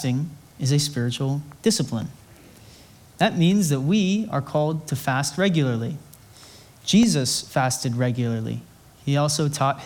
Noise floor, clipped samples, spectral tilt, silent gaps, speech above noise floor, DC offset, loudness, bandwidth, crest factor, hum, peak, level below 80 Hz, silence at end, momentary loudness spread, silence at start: -49 dBFS; under 0.1%; -5 dB/octave; none; 27 dB; under 0.1%; -23 LUFS; 19 kHz; 18 dB; none; -4 dBFS; -58 dBFS; 0 s; 12 LU; 0 s